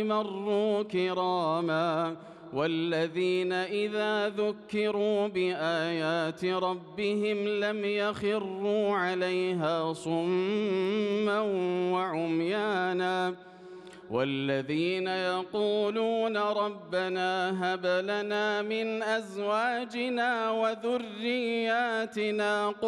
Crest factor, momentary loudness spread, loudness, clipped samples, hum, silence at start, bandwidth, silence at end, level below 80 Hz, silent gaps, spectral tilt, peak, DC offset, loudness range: 12 dB; 4 LU; -29 LUFS; under 0.1%; none; 0 s; 11.5 kHz; 0 s; -76 dBFS; none; -5.5 dB/octave; -16 dBFS; under 0.1%; 1 LU